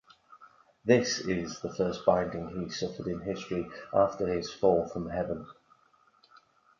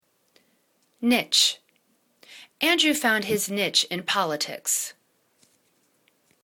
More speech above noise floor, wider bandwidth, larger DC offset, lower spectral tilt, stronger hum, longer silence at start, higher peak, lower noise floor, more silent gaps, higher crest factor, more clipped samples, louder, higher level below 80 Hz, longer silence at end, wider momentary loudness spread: second, 36 dB vs 44 dB; second, 7.4 kHz vs 19 kHz; neither; first, -5 dB/octave vs -1.5 dB/octave; neither; second, 0.3 s vs 1 s; about the same, -8 dBFS vs -6 dBFS; about the same, -65 dBFS vs -67 dBFS; neither; about the same, 24 dB vs 22 dB; neither; second, -30 LUFS vs -22 LUFS; first, -56 dBFS vs -74 dBFS; second, 1.3 s vs 1.5 s; about the same, 10 LU vs 8 LU